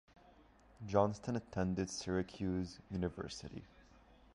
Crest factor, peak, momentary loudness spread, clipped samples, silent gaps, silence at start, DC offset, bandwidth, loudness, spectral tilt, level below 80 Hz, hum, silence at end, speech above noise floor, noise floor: 24 dB; -18 dBFS; 14 LU; under 0.1%; none; 0.25 s; under 0.1%; 11.5 kHz; -39 LUFS; -6 dB/octave; -58 dBFS; none; 0.55 s; 26 dB; -65 dBFS